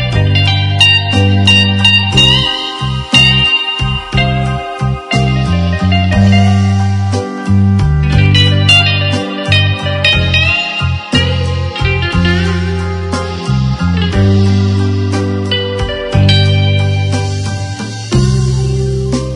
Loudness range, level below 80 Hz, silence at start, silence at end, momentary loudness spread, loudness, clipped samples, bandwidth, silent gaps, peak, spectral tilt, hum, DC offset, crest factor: 5 LU; -26 dBFS; 0 s; 0 s; 10 LU; -11 LUFS; 0.2%; 10.5 kHz; none; 0 dBFS; -5.5 dB/octave; none; under 0.1%; 10 dB